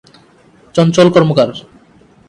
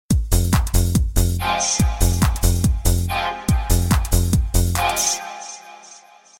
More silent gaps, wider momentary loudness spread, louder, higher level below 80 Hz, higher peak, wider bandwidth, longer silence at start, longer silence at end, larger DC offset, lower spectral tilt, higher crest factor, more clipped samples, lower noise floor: neither; first, 10 LU vs 5 LU; first, -11 LUFS vs -19 LUFS; second, -52 dBFS vs -22 dBFS; first, 0 dBFS vs -4 dBFS; second, 10.5 kHz vs 17 kHz; first, 0.75 s vs 0.1 s; first, 0.7 s vs 0.45 s; neither; first, -6.5 dB/octave vs -4.5 dB/octave; about the same, 14 dB vs 16 dB; neither; about the same, -46 dBFS vs -46 dBFS